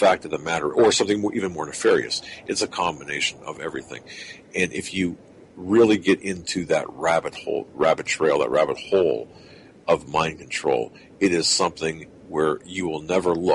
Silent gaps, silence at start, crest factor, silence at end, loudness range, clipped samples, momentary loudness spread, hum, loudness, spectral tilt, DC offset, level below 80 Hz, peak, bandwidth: none; 0 s; 18 dB; 0 s; 4 LU; under 0.1%; 13 LU; none; -23 LUFS; -3.5 dB/octave; under 0.1%; -56 dBFS; -6 dBFS; 11.5 kHz